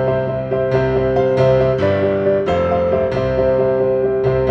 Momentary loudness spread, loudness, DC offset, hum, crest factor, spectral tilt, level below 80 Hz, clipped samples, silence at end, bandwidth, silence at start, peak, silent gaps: 4 LU; -16 LUFS; under 0.1%; none; 12 dB; -8.5 dB/octave; -36 dBFS; under 0.1%; 0 s; 6.8 kHz; 0 s; -2 dBFS; none